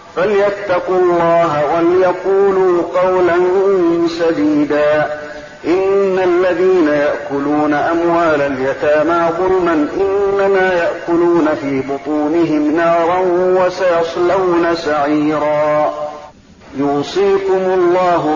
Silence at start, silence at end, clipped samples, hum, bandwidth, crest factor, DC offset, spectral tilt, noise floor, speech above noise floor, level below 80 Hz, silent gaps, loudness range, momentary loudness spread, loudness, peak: 0 s; 0 s; under 0.1%; none; 7.4 kHz; 8 dB; under 0.1%; -6.5 dB/octave; -38 dBFS; 25 dB; -48 dBFS; none; 2 LU; 5 LU; -14 LUFS; -4 dBFS